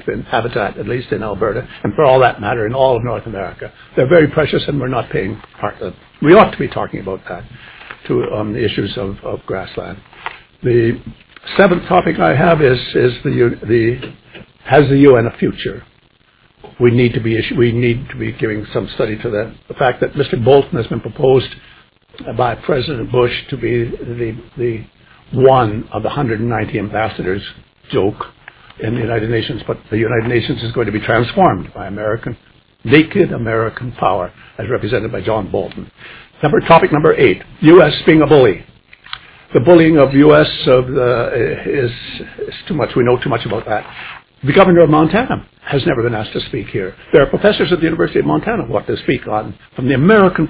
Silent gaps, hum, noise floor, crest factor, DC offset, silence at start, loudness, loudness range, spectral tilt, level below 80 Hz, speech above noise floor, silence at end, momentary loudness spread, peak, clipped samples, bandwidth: none; none; -52 dBFS; 14 dB; under 0.1%; 0.05 s; -14 LUFS; 8 LU; -11 dB/octave; -38 dBFS; 38 dB; 0 s; 17 LU; 0 dBFS; 0.2%; 4 kHz